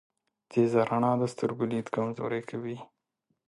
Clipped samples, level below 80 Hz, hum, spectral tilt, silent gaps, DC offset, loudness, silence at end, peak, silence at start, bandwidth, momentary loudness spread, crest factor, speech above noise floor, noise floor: under 0.1%; -72 dBFS; none; -7.5 dB/octave; none; under 0.1%; -29 LUFS; 0.65 s; -12 dBFS; 0.5 s; 11.5 kHz; 12 LU; 18 dB; 51 dB; -79 dBFS